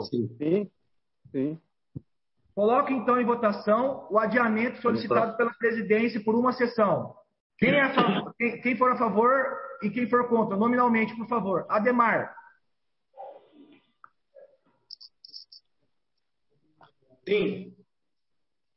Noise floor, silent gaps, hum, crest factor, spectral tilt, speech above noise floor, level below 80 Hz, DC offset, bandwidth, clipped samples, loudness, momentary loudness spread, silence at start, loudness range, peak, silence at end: -86 dBFS; 7.40-7.50 s; none; 18 dB; -10 dB/octave; 61 dB; -70 dBFS; under 0.1%; 5.8 kHz; under 0.1%; -25 LUFS; 22 LU; 0 s; 11 LU; -8 dBFS; 1.05 s